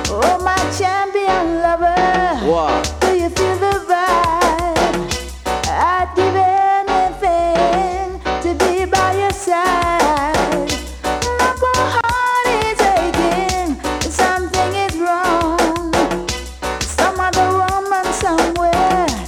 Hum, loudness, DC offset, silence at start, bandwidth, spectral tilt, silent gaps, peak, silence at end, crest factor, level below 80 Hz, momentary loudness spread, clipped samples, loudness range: none; -16 LUFS; under 0.1%; 0 s; 17.5 kHz; -4 dB/octave; none; -2 dBFS; 0 s; 14 dB; -32 dBFS; 6 LU; under 0.1%; 1 LU